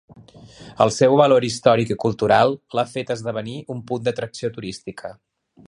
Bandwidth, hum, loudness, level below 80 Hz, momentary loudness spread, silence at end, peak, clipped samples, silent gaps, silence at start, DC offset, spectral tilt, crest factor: 11.5 kHz; none; -20 LUFS; -56 dBFS; 17 LU; 0.55 s; -2 dBFS; under 0.1%; none; 0.4 s; under 0.1%; -5.5 dB/octave; 20 dB